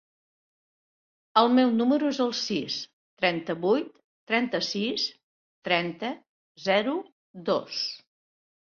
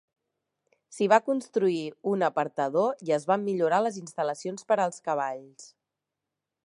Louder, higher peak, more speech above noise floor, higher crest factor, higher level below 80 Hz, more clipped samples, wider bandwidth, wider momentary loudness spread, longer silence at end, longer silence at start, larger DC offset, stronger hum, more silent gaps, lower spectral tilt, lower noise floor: about the same, -27 LUFS vs -27 LUFS; about the same, -4 dBFS vs -6 dBFS; first, over 64 dB vs 60 dB; about the same, 24 dB vs 22 dB; first, -74 dBFS vs -84 dBFS; neither; second, 7 kHz vs 11.5 kHz; first, 14 LU vs 8 LU; second, 0.75 s vs 1 s; first, 1.35 s vs 0.9 s; neither; neither; first, 2.93-3.17 s, 4.04-4.27 s, 5.23-5.62 s, 6.29-6.55 s, 7.12-7.34 s vs none; about the same, -4.5 dB/octave vs -5.5 dB/octave; about the same, under -90 dBFS vs -87 dBFS